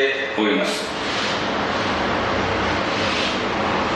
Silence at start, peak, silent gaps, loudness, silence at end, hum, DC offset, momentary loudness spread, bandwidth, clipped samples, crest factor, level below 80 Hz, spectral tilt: 0 s; -6 dBFS; none; -21 LUFS; 0 s; none; under 0.1%; 2 LU; 12.5 kHz; under 0.1%; 14 dB; -42 dBFS; -4 dB/octave